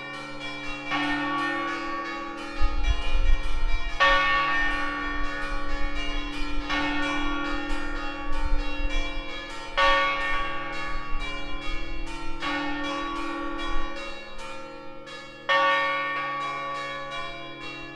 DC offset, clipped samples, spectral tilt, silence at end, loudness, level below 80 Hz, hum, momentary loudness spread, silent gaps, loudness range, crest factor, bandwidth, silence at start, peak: under 0.1%; under 0.1%; -4 dB/octave; 0 s; -28 LUFS; -30 dBFS; none; 14 LU; none; 6 LU; 18 dB; 9.4 kHz; 0 s; -8 dBFS